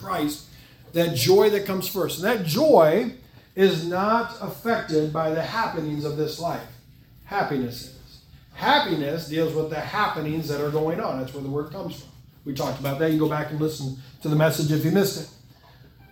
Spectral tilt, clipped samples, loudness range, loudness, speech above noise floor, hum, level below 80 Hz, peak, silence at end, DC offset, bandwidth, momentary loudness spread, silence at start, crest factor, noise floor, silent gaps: -5.5 dB/octave; under 0.1%; 7 LU; -24 LUFS; 28 dB; none; -56 dBFS; -4 dBFS; 0.8 s; under 0.1%; 18 kHz; 14 LU; 0 s; 20 dB; -51 dBFS; none